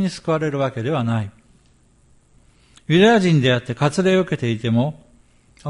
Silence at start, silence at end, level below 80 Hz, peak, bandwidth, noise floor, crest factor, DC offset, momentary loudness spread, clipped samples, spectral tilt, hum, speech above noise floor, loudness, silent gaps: 0 s; 0 s; -54 dBFS; -2 dBFS; 11.5 kHz; -55 dBFS; 18 dB; under 0.1%; 11 LU; under 0.1%; -6.5 dB/octave; none; 37 dB; -19 LUFS; none